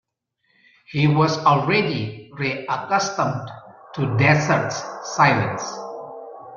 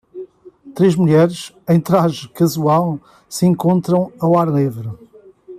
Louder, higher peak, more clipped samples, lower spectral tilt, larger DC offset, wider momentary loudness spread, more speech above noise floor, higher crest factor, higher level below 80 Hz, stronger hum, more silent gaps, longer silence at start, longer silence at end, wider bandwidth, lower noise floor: second, -20 LUFS vs -16 LUFS; about the same, -2 dBFS vs -2 dBFS; neither; second, -5.5 dB/octave vs -7.5 dB/octave; neither; about the same, 17 LU vs 16 LU; first, 50 dB vs 26 dB; first, 20 dB vs 14 dB; about the same, -58 dBFS vs -56 dBFS; neither; neither; first, 0.9 s vs 0.15 s; about the same, 0 s vs 0 s; second, 7.2 kHz vs 15 kHz; first, -70 dBFS vs -42 dBFS